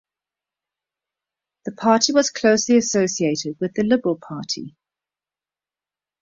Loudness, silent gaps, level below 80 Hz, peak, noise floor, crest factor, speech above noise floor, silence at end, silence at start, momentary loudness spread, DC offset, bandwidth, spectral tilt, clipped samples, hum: -20 LUFS; none; -62 dBFS; -2 dBFS; under -90 dBFS; 20 dB; over 71 dB; 1.55 s; 1.65 s; 13 LU; under 0.1%; 7.8 kHz; -3.5 dB/octave; under 0.1%; none